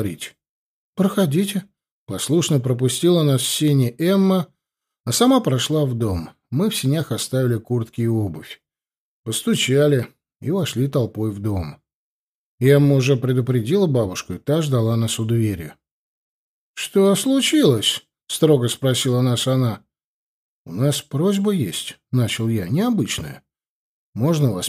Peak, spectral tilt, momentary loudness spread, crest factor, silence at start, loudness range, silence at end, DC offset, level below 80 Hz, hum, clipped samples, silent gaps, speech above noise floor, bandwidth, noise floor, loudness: -4 dBFS; -5.5 dB/octave; 13 LU; 16 dB; 0 s; 4 LU; 0 s; under 0.1%; -52 dBFS; none; under 0.1%; 0.49-0.93 s, 1.91-2.06 s, 5.00-5.04 s, 8.97-9.24 s, 11.94-12.58 s, 15.91-16.74 s, 20.04-20.65 s, 23.68-24.13 s; over 71 dB; 15.5 kHz; under -90 dBFS; -20 LUFS